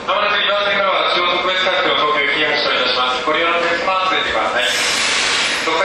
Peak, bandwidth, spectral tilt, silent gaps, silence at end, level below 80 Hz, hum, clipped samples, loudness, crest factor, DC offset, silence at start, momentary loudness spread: -2 dBFS; 13.5 kHz; -1 dB/octave; none; 0 s; -50 dBFS; none; under 0.1%; -15 LUFS; 14 dB; under 0.1%; 0 s; 2 LU